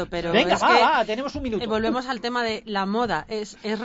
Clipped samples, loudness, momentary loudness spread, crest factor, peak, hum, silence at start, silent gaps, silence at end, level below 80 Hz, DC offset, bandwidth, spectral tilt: under 0.1%; -23 LUFS; 11 LU; 18 dB; -4 dBFS; none; 0 s; none; 0 s; -48 dBFS; under 0.1%; 8 kHz; -4.5 dB/octave